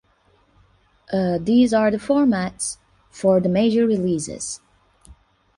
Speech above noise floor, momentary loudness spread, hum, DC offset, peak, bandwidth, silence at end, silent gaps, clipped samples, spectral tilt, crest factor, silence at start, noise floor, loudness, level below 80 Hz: 41 dB; 12 LU; none; under 0.1%; -6 dBFS; 11.5 kHz; 0.45 s; none; under 0.1%; -5.5 dB/octave; 16 dB; 1.1 s; -60 dBFS; -20 LUFS; -54 dBFS